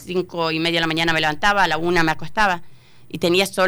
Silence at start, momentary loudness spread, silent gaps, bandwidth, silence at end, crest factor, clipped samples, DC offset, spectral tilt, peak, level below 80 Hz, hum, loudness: 0 s; 7 LU; none; over 20 kHz; 0 s; 12 dB; under 0.1%; under 0.1%; -4 dB/octave; -8 dBFS; -44 dBFS; none; -19 LUFS